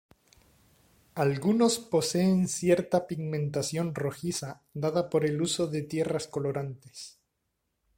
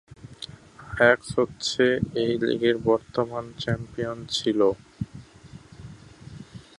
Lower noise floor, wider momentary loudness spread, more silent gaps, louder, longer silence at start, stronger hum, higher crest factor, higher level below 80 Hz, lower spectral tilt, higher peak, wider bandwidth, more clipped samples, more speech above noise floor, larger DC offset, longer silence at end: first, -80 dBFS vs -47 dBFS; second, 14 LU vs 23 LU; neither; second, -29 LUFS vs -24 LUFS; first, 1.15 s vs 0.2 s; neither; second, 18 dB vs 24 dB; second, -64 dBFS vs -52 dBFS; about the same, -5.5 dB/octave vs -5 dB/octave; second, -10 dBFS vs -4 dBFS; first, 16.5 kHz vs 11.5 kHz; neither; first, 51 dB vs 23 dB; neither; first, 0.9 s vs 0.2 s